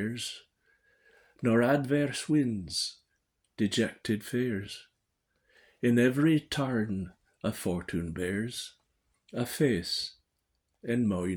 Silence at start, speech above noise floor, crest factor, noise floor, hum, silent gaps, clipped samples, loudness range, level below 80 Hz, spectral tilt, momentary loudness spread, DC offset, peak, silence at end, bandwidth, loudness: 0 s; 50 dB; 20 dB; -79 dBFS; none; none; under 0.1%; 4 LU; -60 dBFS; -5.5 dB/octave; 14 LU; under 0.1%; -12 dBFS; 0 s; over 20 kHz; -30 LUFS